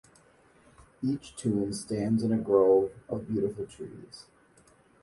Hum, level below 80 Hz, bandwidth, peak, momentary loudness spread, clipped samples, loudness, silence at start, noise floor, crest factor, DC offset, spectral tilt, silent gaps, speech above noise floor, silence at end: none; -60 dBFS; 11.5 kHz; -10 dBFS; 20 LU; under 0.1%; -29 LUFS; 1 s; -61 dBFS; 20 dB; under 0.1%; -7 dB/octave; none; 33 dB; 0.8 s